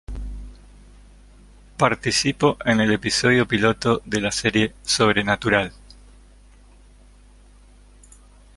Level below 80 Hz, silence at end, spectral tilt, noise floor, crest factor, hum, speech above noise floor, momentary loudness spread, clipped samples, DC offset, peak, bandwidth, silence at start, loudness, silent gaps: -42 dBFS; 2.85 s; -4 dB/octave; -49 dBFS; 22 dB; 50 Hz at -45 dBFS; 29 dB; 15 LU; under 0.1%; under 0.1%; -2 dBFS; 11.5 kHz; 0.1 s; -20 LUFS; none